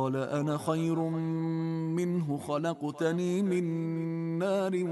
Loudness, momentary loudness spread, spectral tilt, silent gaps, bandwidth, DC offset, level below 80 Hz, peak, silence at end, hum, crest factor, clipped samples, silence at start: -31 LUFS; 3 LU; -7.5 dB/octave; none; 12.5 kHz; under 0.1%; -72 dBFS; -16 dBFS; 0 s; none; 14 dB; under 0.1%; 0 s